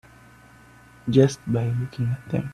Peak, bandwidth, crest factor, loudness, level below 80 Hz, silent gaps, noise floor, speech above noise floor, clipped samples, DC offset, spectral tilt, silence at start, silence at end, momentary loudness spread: -4 dBFS; 11.5 kHz; 20 dB; -23 LUFS; -54 dBFS; none; -50 dBFS; 28 dB; under 0.1%; under 0.1%; -7.5 dB/octave; 1.05 s; 0 s; 9 LU